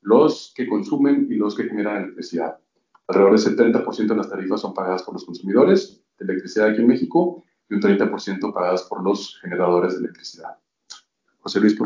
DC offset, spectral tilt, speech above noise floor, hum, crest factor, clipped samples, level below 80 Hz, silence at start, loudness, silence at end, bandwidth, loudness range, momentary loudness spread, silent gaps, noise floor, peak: under 0.1%; -6.5 dB/octave; 35 dB; none; 18 dB; under 0.1%; -70 dBFS; 0.05 s; -20 LUFS; 0 s; 7.6 kHz; 4 LU; 15 LU; none; -54 dBFS; -2 dBFS